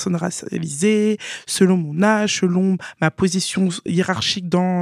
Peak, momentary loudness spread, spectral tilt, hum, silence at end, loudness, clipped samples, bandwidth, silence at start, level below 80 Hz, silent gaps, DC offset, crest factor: 0 dBFS; 7 LU; -5 dB/octave; none; 0 s; -19 LUFS; under 0.1%; 14.5 kHz; 0 s; -54 dBFS; none; under 0.1%; 18 dB